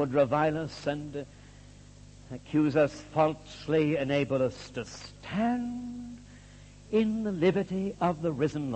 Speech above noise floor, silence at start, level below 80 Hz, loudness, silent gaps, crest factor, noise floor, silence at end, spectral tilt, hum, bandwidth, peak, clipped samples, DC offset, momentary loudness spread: 22 dB; 0 s; -56 dBFS; -29 LUFS; none; 18 dB; -51 dBFS; 0 s; -7 dB/octave; 50 Hz at -50 dBFS; 8.8 kHz; -12 dBFS; under 0.1%; under 0.1%; 16 LU